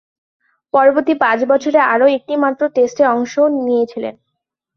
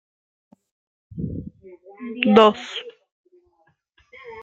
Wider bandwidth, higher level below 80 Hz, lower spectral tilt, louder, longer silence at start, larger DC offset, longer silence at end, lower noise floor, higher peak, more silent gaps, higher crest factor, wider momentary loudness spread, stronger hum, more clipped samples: second, 6.8 kHz vs 7.8 kHz; second, -64 dBFS vs -54 dBFS; second, -4.5 dB/octave vs -6.5 dB/octave; first, -14 LUFS vs -19 LUFS; second, 0.75 s vs 1.15 s; neither; first, 0.65 s vs 0 s; first, -76 dBFS vs -65 dBFS; about the same, -2 dBFS vs 0 dBFS; second, none vs 3.12-3.24 s; second, 14 dB vs 24 dB; second, 6 LU vs 27 LU; neither; neither